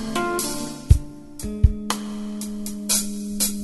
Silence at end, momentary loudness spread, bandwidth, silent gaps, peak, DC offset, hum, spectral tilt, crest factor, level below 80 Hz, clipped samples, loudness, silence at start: 0 s; 10 LU; 12.5 kHz; none; 0 dBFS; under 0.1%; none; -4.5 dB/octave; 22 dB; -28 dBFS; under 0.1%; -24 LUFS; 0 s